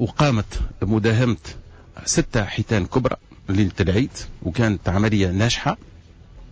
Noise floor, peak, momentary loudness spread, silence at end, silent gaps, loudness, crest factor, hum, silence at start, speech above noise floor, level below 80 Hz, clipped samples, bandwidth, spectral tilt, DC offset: -44 dBFS; -6 dBFS; 10 LU; 0 s; none; -22 LUFS; 14 dB; none; 0 s; 23 dB; -34 dBFS; under 0.1%; 8 kHz; -5.5 dB/octave; under 0.1%